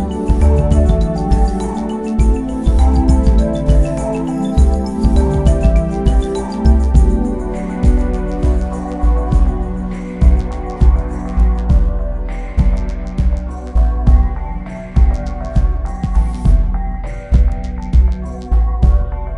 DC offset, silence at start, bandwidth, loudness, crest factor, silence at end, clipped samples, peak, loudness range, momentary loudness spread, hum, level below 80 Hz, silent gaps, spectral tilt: under 0.1%; 0 s; 10 kHz; -16 LUFS; 12 dB; 0 s; under 0.1%; 0 dBFS; 3 LU; 9 LU; none; -14 dBFS; none; -8.5 dB/octave